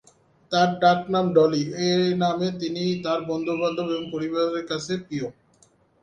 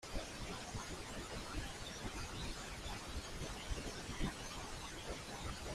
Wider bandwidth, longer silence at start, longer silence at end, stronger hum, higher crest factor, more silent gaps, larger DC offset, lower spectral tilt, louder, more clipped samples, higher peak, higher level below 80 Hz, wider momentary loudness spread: second, 9.4 kHz vs 15.5 kHz; first, 0.5 s vs 0 s; first, 0.7 s vs 0 s; neither; about the same, 18 dB vs 18 dB; neither; neither; first, -6 dB/octave vs -3.5 dB/octave; first, -24 LUFS vs -46 LUFS; neither; first, -6 dBFS vs -28 dBFS; second, -64 dBFS vs -50 dBFS; first, 9 LU vs 3 LU